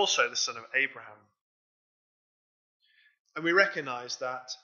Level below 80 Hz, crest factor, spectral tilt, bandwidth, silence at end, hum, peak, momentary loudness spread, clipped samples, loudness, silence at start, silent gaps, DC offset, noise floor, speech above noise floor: under -90 dBFS; 24 dB; -1.5 dB/octave; 7.6 kHz; 0.1 s; none; -8 dBFS; 12 LU; under 0.1%; -28 LUFS; 0 s; 1.41-2.80 s, 3.19-3.25 s; under 0.1%; under -90 dBFS; over 60 dB